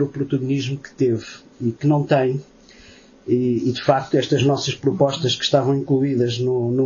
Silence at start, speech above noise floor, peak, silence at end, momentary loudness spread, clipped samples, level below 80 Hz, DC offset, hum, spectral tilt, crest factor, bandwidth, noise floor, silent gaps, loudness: 0 s; 27 dB; -4 dBFS; 0 s; 9 LU; under 0.1%; -58 dBFS; under 0.1%; none; -6 dB/octave; 16 dB; 7.4 kHz; -47 dBFS; none; -20 LUFS